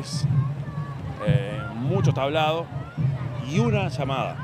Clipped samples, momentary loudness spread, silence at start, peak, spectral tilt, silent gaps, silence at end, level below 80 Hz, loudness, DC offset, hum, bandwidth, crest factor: under 0.1%; 9 LU; 0 s; -8 dBFS; -7 dB/octave; none; 0 s; -50 dBFS; -25 LUFS; under 0.1%; none; 10.5 kHz; 16 dB